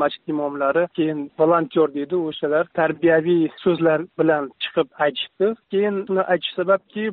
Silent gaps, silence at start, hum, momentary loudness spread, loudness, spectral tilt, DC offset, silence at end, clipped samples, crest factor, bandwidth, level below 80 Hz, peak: none; 0 s; none; 6 LU; -21 LUFS; -4 dB/octave; under 0.1%; 0 s; under 0.1%; 14 dB; 4.6 kHz; -66 dBFS; -6 dBFS